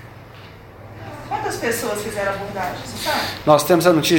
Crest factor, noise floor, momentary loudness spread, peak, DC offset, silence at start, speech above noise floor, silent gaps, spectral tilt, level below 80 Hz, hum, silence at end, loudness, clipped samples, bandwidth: 20 dB; -40 dBFS; 25 LU; 0 dBFS; under 0.1%; 0 s; 21 dB; none; -4.5 dB/octave; -48 dBFS; none; 0 s; -20 LUFS; under 0.1%; 17 kHz